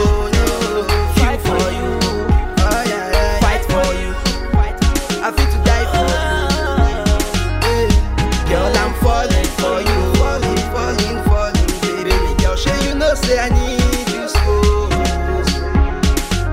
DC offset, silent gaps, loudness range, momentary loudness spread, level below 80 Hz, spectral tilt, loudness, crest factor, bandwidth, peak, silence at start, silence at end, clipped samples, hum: under 0.1%; none; 1 LU; 3 LU; -18 dBFS; -5 dB/octave; -16 LUFS; 14 dB; 16.5 kHz; 0 dBFS; 0 s; 0 s; under 0.1%; none